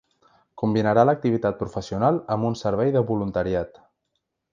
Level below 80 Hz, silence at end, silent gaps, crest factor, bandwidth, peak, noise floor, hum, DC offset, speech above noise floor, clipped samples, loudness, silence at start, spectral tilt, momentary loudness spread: -50 dBFS; 0.85 s; none; 20 dB; 7.6 kHz; -4 dBFS; -77 dBFS; none; under 0.1%; 55 dB; under 0.1%; -23 LUFS; 0.55 s; -8 dB/octave; 10 LU